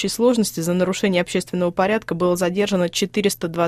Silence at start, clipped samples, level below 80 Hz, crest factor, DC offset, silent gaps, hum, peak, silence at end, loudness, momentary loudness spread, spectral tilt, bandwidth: 0 s; under 0.1%; -54 dBFS; 14 dB; under 0.1%; none; none; -6 dBFS; 0 s; -20 LUFS; 4 LU; -5 dB/octave; 14.5 kHz